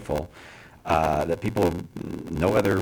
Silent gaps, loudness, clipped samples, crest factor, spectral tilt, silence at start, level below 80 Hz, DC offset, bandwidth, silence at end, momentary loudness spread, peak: none; -25 LUFS; under 0.1%; 18 dB; -6.5 dB/octave; 0 s; -42 dBFS; under 0.1%; over 20 kHz; 0 s; 18 LU; -8 dBFS